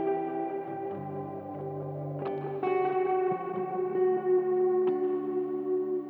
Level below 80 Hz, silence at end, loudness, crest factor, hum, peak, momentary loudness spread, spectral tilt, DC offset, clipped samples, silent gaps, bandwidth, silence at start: -84 dBFS; 0 s; -30 LUFS; 12 dB; none; -18 dBFS; 10 LU; -10.5 dB/octave; under 0.1%; under 0.1%; none; 3.9 kHz; 0 s